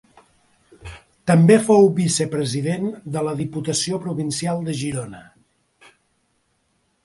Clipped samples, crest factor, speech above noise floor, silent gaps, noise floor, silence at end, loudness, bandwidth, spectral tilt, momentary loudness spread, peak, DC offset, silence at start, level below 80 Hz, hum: under 0.1%; 20 dB; 48 dB; none; -67 dBFS; 1.85 s; -20 LUFS; 11.5 kHz; -5.5 dB/octave; 16 LU; -2 dBFS; under 0.1%; 0.85 s; -54 dBFS; none